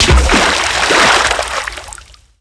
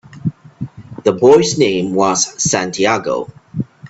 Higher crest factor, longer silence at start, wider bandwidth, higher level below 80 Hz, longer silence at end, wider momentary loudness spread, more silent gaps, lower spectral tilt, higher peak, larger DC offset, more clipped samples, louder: about the same, 12 dB vs 16 dB; about the same, 0 s vs 0.1 s; first, 11 kHz vs 8.4 kHz; first, -20 dBFS vs -52 dBFS; first, 0.45 s vs 0 s; second, 16 LU vs 19 LU; neither; about the same, -3 dB/octave vs -4 dB/octave; about the same, 0 dBFS vs 0 dBFS; neither; neither; first, -11 LUFS vs -14 LUFS